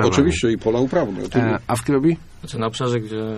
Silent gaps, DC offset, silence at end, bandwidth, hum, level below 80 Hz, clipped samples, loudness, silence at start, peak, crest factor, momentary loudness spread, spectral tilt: none; under 0.1%; 0 s; 13.5 kHz; none; -40 dBFS; under 0.1%; -20 LUFS; 0 s; -2 dBFS; 18 dB; 8 LU; -6 dB/octave